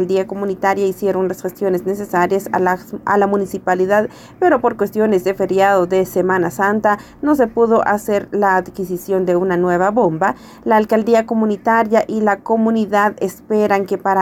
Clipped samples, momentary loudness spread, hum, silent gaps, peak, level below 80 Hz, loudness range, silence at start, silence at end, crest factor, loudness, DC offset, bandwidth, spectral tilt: under 0.1%; 5 LU; none; none; -2 dBFS; -52 dBFS; 2 LU; 0 s; 0 s; 12 dB; -16 LUFS; under 0.1%; 16.5 kHz; -6.5 dB/octave